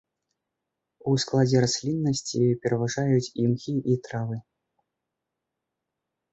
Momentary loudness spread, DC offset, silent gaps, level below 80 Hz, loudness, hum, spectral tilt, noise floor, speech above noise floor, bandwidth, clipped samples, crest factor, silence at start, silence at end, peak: 10 LU; under 0.1%; none; -62 dBFS; -25 LUFS; none; -6 dB/octave; -84 dBFS; 60 dB; 8.2 kHz; under 0.1%; 18 dB; 1.05 s; 1.9 s; -10 dBFS